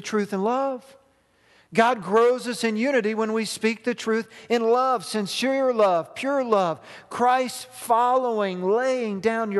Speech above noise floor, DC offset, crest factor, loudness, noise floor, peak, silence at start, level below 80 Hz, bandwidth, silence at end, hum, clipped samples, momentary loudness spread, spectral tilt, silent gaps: 39 dB; under 0.1%; 20 dB; -23 LUFS; -61 dBFS; -4 dBFS; 0 s; -72 dBFS; 12.5 kHz; 0 s; none; under 0.1%; 7 LU; -4.5 dB/octave; none